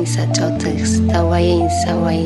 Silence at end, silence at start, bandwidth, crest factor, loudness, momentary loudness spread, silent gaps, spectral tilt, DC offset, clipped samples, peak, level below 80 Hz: 0 s; 0 s; 11.5 kHz; 12 dB; -16 LUFS; 3 LU; none; -6 dB/octave; under 0.1%; under 0.1%; -4 dBFS; -32 dBFS